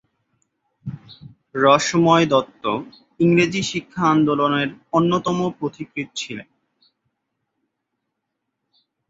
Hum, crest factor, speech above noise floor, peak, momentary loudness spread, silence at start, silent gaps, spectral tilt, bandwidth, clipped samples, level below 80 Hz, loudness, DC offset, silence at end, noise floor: none; 20 dB; 59 dB; -2 dBFS; 18 LU; 0.85 s; none; -5.5 dB/octave; 8 kHz; under 0.1%; -60 dBFS; -19 LUFS; under 0.1%; 2.65 s; -78 dBFS